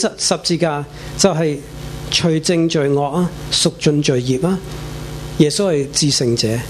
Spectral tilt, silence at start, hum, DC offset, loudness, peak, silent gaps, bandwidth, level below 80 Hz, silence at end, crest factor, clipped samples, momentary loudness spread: -4.5 dB/octave; 0 s; none; under 0.1%; -16 LUFS; 0 dBFS; none; 14 kHz; -38 dBFS; 0 s; 18 dB; under 0.1%; 13 LU